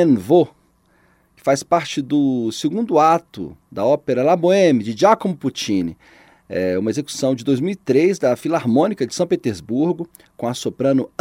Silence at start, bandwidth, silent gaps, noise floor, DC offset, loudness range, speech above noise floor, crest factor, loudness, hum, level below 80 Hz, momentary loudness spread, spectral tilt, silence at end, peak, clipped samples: 0 s; 16 kHz; none; -58 dBFS; under 0.1%; 3 LU; 40 dB; 18 dB; -19 LUFS; none; -58 dBFS; 10 LU; -6 dB/octave; 0.15 s; 0 dBFS; under 0.1%